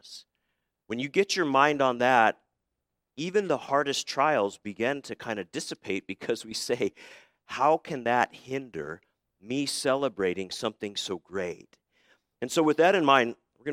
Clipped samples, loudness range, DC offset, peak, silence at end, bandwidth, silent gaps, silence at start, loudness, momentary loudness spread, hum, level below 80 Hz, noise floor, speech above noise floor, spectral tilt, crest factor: under 0.1%; 6 LU; under 0.1%; -6 dBFS; 0 s; 16 kHz; none; 0.05 s; -27 LUFS; 15 LU; none; -72 dBFS; -83 dBFS; 56 dB; -3.5 dB/octave; 24 dB